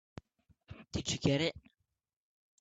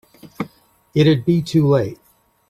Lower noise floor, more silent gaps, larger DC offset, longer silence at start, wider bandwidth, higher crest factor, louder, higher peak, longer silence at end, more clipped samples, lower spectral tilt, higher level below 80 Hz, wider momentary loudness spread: first, -85 dBFS vs -50 dBFS; neither; neither; first, 0.7 s vs 0.25 s; second, 9 kHz vs 13.5 kHz; first, 22 dB vs 16 dB; second, -34 LUFS vs -17 LUFS; second, -16 dBFS vs -4 dBFS; first, 1 s vs 0.55 s; neither; second, -4.5 dB/octave vs -7.5 dB/octave; second, -60 dBFS vs -52 dBFS; first, 24 LU vs 16 LU